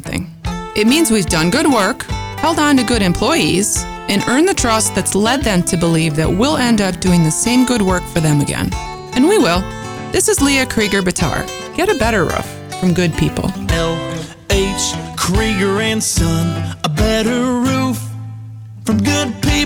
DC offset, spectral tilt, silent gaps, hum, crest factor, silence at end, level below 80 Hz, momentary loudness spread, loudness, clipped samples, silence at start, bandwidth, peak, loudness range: under 0.1%; -4.5 dB/octave; none; none; 12 dB; 0 s; -30 dBFS; 10 LU; -15 LUFS; under 0.1%; 0 s; over 20 kHz; -2 dBFS; 3 LU